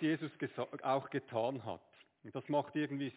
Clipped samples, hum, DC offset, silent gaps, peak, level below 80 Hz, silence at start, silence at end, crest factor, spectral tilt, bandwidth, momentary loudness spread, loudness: under 0.1%; none; under 0.1%; none; -22 dBFS; -80 dBFS; 0 s; 0 s; 16 dB; -5 dB/octave; 4 kHz; 12 LU; -39 LUFS